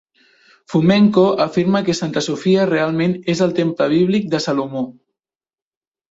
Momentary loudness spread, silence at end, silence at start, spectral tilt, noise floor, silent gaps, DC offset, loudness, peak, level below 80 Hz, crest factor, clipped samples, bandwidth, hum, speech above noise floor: 8 LU; 1.2 s; 0.7 s; -6.5 dB/octave; under -90 dBFS; none; under 0.1%; -17 LUFS; -2 dBFS; -58 dBFS; 16 dB; under 0.1%; 8 kHz; none; over 74 dB